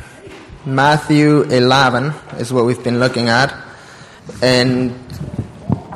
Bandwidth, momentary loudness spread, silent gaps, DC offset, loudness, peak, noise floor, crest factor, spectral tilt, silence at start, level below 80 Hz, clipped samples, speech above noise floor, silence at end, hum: 13 kHz; 17 LU; none; under 0.1%; -14 LUFS; 0 dBFS; -38 dBFS; 16 dB; -5.5 dB/octave; 0 s; -44 dBFS; under 0.1%; 24 dB; 0 s; none